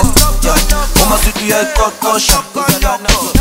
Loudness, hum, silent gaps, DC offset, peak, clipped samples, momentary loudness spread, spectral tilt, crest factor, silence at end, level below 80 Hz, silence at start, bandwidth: -11 LUFS; none; none; under 0.1%; 0 dBFS; 0.3%; 3 LU; -3 dB/octave; 10 dB; 0 s; -16 dBFS; 0 s; 19.5 kHz